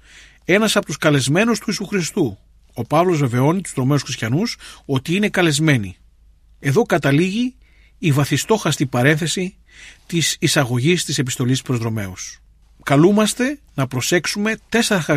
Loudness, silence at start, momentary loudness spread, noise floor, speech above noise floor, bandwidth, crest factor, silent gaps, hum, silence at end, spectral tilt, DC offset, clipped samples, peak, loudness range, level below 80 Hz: -18 LUFS; 0.5 s; 9 LU; -50 dBFS; 32 dB; 15.5 kHz; 16 dB; none; none; 0 s; -5 dB/octave; under 0.1%; under 0.1%; -2 dBFS; 2 LU; -50 dBFS